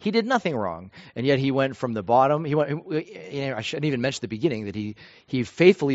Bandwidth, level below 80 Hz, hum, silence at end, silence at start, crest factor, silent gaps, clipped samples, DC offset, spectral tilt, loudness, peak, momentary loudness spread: 8 kHz; -62 dBFS; none; 0 s; 0 s; 22 dB; none; under 0.1%; under 0.1%; -5 dB/octave; -24 LUFS; -2 dBFS; 12 LU